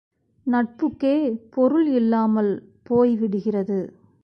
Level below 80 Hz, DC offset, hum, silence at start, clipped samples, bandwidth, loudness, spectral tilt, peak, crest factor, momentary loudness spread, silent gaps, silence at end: -62 dBFS; under 0.1%; none; 0.45 s; under 0.1%; 5.6 kHz; -22 LUFS; -9.5 dB/octave; -8 dBFS; 14 dB; 8 LU; none; 0.35 s